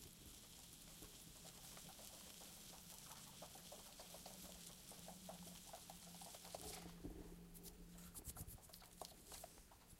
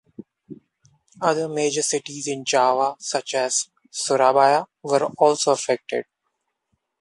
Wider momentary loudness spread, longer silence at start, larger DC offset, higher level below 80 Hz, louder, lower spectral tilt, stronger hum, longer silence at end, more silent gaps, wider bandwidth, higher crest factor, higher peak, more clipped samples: second, 5 LU vs 9 LU; second, 0 s vs 0.2 s; neither; first, -68 dBFS vs -74 dBFS; second, -57 LUFS vs -21 LUFS; about the same, -3 dB/octave vs -2.5 dB/octave; neither; second, 0 s vs 1 s; neither; first, 16 kHz vs 11.5 kHz; first, 26 dB vs 20 dB; second, -32 dBFS vs -2 dBFS; neither